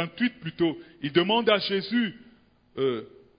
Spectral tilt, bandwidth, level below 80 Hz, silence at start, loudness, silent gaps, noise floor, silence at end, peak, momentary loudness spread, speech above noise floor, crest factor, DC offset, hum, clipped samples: -9.5 dB/octave; 5.2 kHz; -64 dBFS; 0 s; -26 LUFS; none; -58 dBFS; 0.3 s; -6 dBFS; 11 LU; 32 dB; 20 dB; under 0.1%; none; under 0.1%